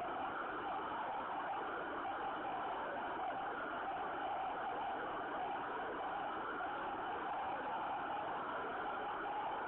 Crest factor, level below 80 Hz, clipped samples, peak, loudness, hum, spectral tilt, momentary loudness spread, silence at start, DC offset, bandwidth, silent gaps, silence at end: 10 dB; -72 dBFS; under 0.1%; -32 dBFS; -42 LUFS; none; -2 dB/octave; 1 LU; 0 s; under 0.1%; 4.2 kHz; none; 0 s